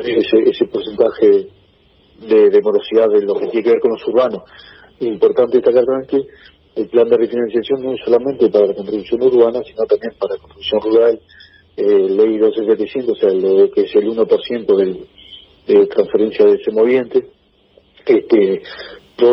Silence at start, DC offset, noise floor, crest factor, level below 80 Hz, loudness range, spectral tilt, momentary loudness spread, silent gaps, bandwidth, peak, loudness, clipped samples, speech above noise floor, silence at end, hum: 0 s; under 0.1%; -52 dBFS; 14 dB; -56 dBFS; 2 LU; -8.5 dB/octave; 11 LU; none; 5.8 kHz; 0 dBFS; -15 LUFS; under 0.1%; 38 dB; 0 s; none